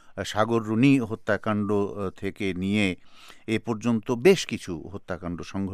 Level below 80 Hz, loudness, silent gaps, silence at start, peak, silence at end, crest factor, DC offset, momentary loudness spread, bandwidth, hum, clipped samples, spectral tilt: -56 dBFS; -26 LUFS; none; 0.05 s; -6 dBFS; 0 s; 18 dB; under 0.1%; 14 LU; 14.5 kHz; none; under 0.1%; -6 dB/octave